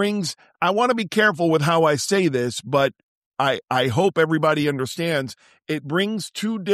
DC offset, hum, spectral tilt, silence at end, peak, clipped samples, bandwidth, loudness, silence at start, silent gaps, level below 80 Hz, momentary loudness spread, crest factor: under 0.1%; none; -5 dB/octave; 0 s; -6 dBFS; under 0.1%; 14 kHz; -21 LUFS; 0 s; 3.03-3.31 s; -64 dBFS; 8 LU; 16 dB